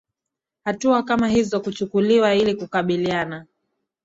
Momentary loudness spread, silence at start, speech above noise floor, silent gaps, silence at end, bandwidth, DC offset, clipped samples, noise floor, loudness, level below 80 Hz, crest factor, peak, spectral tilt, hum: 12 LU; 0.65 s; 65 dB; none; 0.6 s; 8 kHz; under 0.1%; under 0.1%; -85 dBFS; -21 LUFS; -54 dBFS; 16 dB; -6 dBFS; -5.5 dB/octave; none